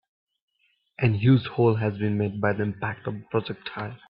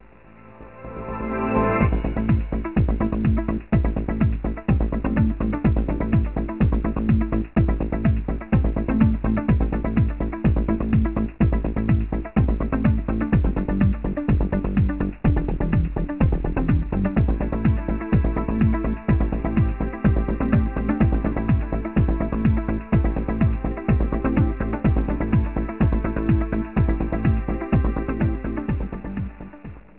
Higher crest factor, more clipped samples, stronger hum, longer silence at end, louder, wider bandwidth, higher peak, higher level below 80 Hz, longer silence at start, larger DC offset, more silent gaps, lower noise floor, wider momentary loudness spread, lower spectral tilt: about the same, 18 dB vs 16 dB; neither; neither; about the same, 0.15 s vs 0.2 s; about the same, -25 LUFS vs -23 LUFS; first, 5.2 kHz vs 4 kHz; about the same, -8 dBFS vs -6 dBFS; second, -60 dBFS vs -26 dBFS; first, 1 s vs 0.45 s; second, under 0.1% vs 0.3%; neither; first, -70 dBFS vs -47 dBFS; first, 13 LU vs 4 LU; about the same, -12 dB/octave vs -13 dB/octave